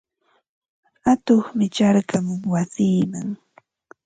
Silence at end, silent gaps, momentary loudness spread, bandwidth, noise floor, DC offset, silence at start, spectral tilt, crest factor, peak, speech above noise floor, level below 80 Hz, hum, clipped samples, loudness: 0.7 s; none; 10 LU; 9.2 kHz; -52 dBFS; under 0.1%; 1.05 s; -6.5 dB/octave; 16 dB; -4 dBFS; 32 dB; -60 dBFS; none; under 0.1%; -21 LUFS